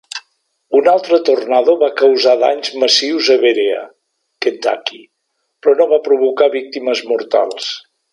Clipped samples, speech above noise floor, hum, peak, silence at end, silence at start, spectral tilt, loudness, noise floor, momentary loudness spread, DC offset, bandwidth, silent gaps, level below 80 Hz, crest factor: under 0.1%; 57 dB; none; 0 dBFS; 0.35 s; 0.15 s; -1.5 dB/octave; -14 LUFS; -70 dBFS; 11 LU; under 0.1%; 11 kHz; none; -72 dBFS; 14 dB